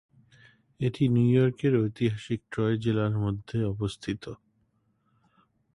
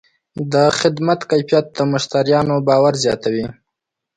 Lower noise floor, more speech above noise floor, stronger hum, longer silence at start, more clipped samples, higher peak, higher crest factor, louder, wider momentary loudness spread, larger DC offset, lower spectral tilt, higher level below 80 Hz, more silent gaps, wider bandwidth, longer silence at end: second, -71 dBFS vs -80 dBFS; second, 45 dB vs 64 dB; neither; first, 0.8 s vs 0.35 s; neither; second, -12 dBFS vs 0 dBFS; about the same, 18 dB vs 16 dB; second, -27 LUFS vs -16 LUFS; first, 12 LU vs 9 LU; neither; first, -8 dB/octave vs -5.5 dB/octave; about the same, -54 dBFS vs -54 dBFS; neither; first, 11 kHz vs 9.4 kHz; first, 1.4 s vs 0.65 s